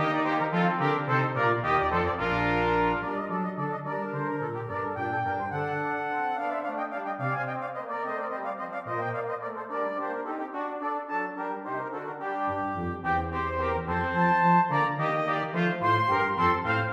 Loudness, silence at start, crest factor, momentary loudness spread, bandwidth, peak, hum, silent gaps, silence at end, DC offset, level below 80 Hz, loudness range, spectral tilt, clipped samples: -28 LUFS; 0 s; 18 dB; 9 LU; 8.4 kHz; -10 dBFS; none; none; 0 s; under 0.1%; -52 dBFS; 7 LU; -7.5 dB/octave; under 0.1%